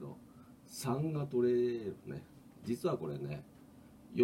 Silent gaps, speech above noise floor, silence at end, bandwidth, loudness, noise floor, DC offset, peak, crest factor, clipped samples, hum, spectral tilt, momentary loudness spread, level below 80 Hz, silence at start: none; 22 dB; 0 s; 16 kHz; -37 LUFS; -58 dBFS; under 0.1%; -18 dBFS; 20 dB; under 0.1%; none; -7 dB/octave; 24 LU; -70 dBFS; 0 s